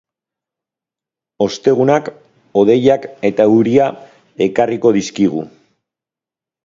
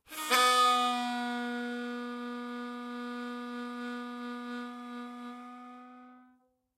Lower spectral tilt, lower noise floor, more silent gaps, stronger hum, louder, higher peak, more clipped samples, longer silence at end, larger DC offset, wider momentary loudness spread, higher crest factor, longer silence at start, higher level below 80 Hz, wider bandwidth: first, -6.5 dB/octave vs -1 dB/octave; first, -88 dBFS vs -68 dBFS; neither; neither; first, -14 LUFS vs -32 LUFS; first, 0 dBFS vs -12 dBFS; neither; first, 1.2 s vs 0.55 s; neither; second, 9 LU vs 21 LU; second, 16 dB vs 22 dB; first, 1.4 s vs 0.1 s; first, -56 dBFS vs -90 dBFS; second, 7.6 kHz vs 16 kHz